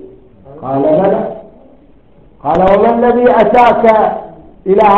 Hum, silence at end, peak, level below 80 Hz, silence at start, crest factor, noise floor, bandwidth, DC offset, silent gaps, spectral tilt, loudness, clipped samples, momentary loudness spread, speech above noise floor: none; 0 s; 0 dBFS; -40 dBFS; 0 s; 12 dB; -44 dBFS; 7.2 kHz; under 0.1%; none; -8 dB/octave; -10 LUFS; 0.2%; 16 LU; 35 dB